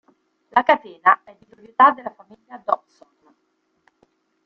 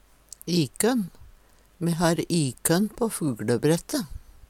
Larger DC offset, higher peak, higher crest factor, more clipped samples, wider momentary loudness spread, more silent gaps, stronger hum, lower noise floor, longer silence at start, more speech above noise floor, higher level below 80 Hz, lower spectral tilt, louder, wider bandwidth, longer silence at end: neither; first, 0 dBFS vs -8 dBFS; about the same, 22 dB vs 18 dB; neither; first, 17 LU vs 8 LU; neither; neither; first, -69 dBFS vs -55 dBFS; about the same, 0.55 s vs 0.45 s; first, 51 dB vs 30 dB; second, -72 dBFS vs -50 dBFS; about the same, -5 dB/octave vs -5 dB/octave; first, -19 LUFS vs -25 LUFS; second, 6 kHz vs 16.5 kHz; first, 1.7 s vs 0.3 s